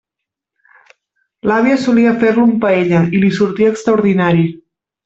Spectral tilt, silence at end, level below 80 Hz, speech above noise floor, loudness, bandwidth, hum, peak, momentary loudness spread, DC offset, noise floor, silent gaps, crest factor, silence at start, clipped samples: -7.5 dB/octave; 0.5 s; -52 dBFS; 69 dB; -13 LUFS; 8 kHz; none; -2 dBFS; 4 LU; under 0.1%; -81 dBFS; none; 12 dB; 1.45 s; under 0.1%